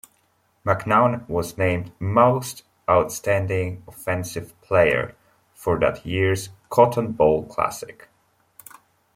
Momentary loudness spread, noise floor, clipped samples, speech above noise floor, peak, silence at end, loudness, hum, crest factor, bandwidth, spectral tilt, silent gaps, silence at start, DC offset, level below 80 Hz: 13 LU; -65 dBFS; under 0.1%; 44 dB; -2 dBFS; 1.25 s; -22 LUFS; none; 20 dB; 16.5 kHz; -6 dB/octave; none; 0.65 s; under 0.1%; -52 dBFS